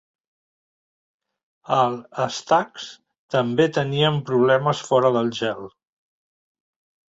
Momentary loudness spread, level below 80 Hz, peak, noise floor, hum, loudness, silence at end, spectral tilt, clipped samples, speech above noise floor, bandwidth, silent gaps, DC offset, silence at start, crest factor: 14 LU; -64 dBFS; -4 dBFS; under -90 dBFS; none; -21 LUFS; 1.5 s; -5.5 dB/octave; under 0.1%; over 69 dB; 8 kHz; 3.18-3.29 s; under 0.1%; 1.7 s; 20 dB